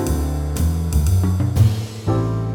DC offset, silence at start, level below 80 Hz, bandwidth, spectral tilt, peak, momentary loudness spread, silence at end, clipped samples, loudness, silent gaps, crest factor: under 0.1%; 0 s; -26 dBFS; 18 kHz; -7 dB/octave; -4 dBFS; 5 LU; 0 s; under 0.1%; -20 LUFS; none; 14 dB